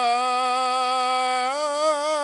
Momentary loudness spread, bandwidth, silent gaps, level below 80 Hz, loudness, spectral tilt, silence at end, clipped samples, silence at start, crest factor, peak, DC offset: 2 LU; 11.5 kHz; none; -80 dBFS; -22 LUFS; 0.5 dB/octave; 0 s; under 0.1%; 0 s; 10 dB; -12 dBFS; under 0.1%